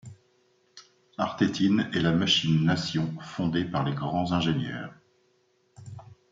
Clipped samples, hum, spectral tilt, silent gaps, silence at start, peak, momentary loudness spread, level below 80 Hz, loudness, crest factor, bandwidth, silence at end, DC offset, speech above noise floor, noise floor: under 0.1%; none; -5.5 dB/octave; none; 0.05 s; -10 dBFS; 22 LU; -60 dBFS; -26 LUFS; 18 dB; 7.8 kHz; 0.2 s; under 0.1%; 42 dB; -68 dBFS